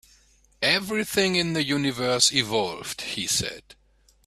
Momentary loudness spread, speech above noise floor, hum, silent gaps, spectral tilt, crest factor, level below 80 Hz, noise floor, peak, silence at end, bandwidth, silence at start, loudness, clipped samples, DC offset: 11 LU; 34 dB; none; none; -2.5 dB/octave; 22 dB; -56 dBFS; -59 dBFS; -4 dBFS; 0.55 s; 15.5 kHz; 0.6 s; -23 LUFS; under 0.1%; under 0.1%